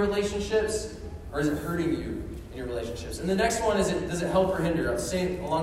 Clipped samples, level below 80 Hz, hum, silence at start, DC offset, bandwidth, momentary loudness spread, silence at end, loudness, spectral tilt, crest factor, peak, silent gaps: under 0.1%; -42 dBFS; none; 0 s; under 0.1%; 16 kHz; 10 LU; 0 s; -28 LUFS; -5 dB/octave; 16 dB; -12 dBFS; none